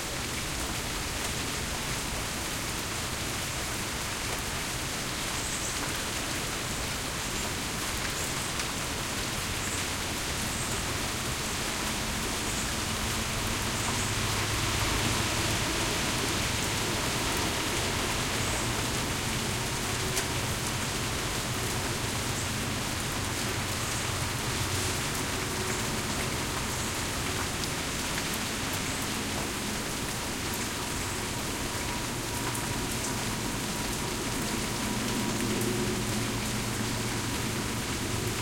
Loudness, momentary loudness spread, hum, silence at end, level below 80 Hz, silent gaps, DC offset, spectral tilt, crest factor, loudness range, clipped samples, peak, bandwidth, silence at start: -30 LUFS; 3 LU; none; 0 s; -44 dBFS; none; under 0.1%; -3 dB/octave; 18 dB; 3 LU; under 0.1%; -14 dBFS; 17 kHz; 0 s